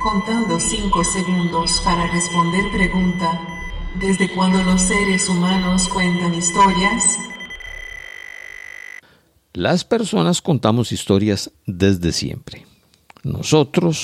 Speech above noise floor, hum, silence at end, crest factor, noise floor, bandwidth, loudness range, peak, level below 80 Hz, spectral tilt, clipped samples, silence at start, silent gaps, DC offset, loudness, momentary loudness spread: 37 dB; none; 0 s; 18 dB; -55 dBFS; 13.5 kHz; 5 LU; 0 dBFS; -34 dBFS; -4 dB/octave; under 0.1%; 0 s; none; under 0.1%; -18 LUFS; 17 LU